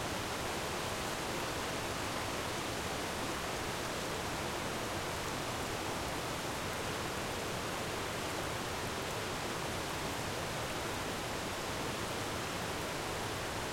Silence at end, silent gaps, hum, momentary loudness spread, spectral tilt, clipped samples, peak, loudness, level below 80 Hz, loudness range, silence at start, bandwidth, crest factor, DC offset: 0 s; none; none; 1 LU; -3.5 dB/octave; under 0.1%; -24 dBFS; -37 LUFS; -54 dBFS; 1 LU; 0 s; 16.5 kHz; 14 dB; under 0.1%